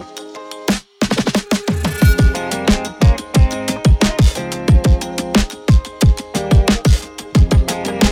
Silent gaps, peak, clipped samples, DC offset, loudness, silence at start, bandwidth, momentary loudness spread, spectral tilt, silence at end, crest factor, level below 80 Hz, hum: none; -2 dBFS; under 0.1%; under 0.1%; -16 LUFS; 0 s; 16.5 kHz; 7 LU; -5.5 dB/octave; 0 s; 12 dB; -18 dBFS; none